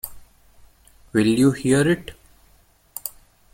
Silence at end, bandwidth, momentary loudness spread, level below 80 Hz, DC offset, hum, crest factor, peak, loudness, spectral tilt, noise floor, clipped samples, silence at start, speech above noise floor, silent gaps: 0.45 s; 17 kHz; 19 LU; -50 dBFS; under 0.1%; none; 18 dB; -6 dBFS; -20 LUFS; -5.5 dB/octave; -57 dBFS; under 0.1%; 0.05 s; 38 dB; none